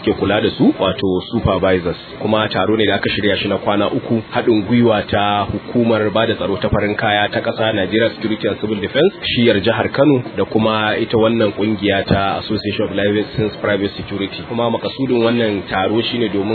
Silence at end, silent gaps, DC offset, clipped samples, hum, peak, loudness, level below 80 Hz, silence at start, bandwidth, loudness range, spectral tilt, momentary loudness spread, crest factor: 0 s; none; under 0.1%; under 0.1%; none; 0 dBFS; -16 LUFS; -42 dBFS; 0 s; 4.6 kHz; 3 LU; -9 dB/octave; 5 LU; 16 dB